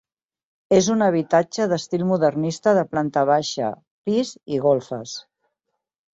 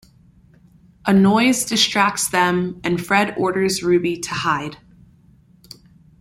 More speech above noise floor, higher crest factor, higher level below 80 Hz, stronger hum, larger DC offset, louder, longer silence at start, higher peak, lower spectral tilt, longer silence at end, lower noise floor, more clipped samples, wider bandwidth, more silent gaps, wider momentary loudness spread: first, 59 dB vs 34 dB; about the same, 18 dB vs 18 dB; second, -62 dBFS vs -54 dBFS; neither; neither; second, -21 LUFS vs -18 LUFS; second, 0.7 s vs 1.05 s; about the same, -4 dBFS vs -2 dBFS; first, -5.5 dB/octave vs -4 dB/octave; second, 0.95 s vs 1.45 s; first, -79 dBFS vs -52 dBFS; neither; second, 8 kHz vs 16 kHz; first, 3.91-4.04 s vs none; about the same, 11 LU vs 9 LU